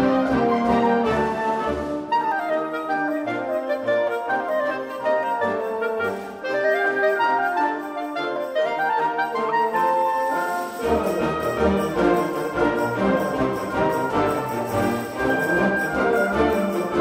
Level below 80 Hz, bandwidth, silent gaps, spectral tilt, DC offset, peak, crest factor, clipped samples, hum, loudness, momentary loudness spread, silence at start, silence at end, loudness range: -46 dBFS; 16 kHz; none; -6 dB/octave; under 0.1%; -6 dBFS; 16 dB; under 0.1%; none; -22 LUFS; 5 LU; 0 s; 0 s; 2 LU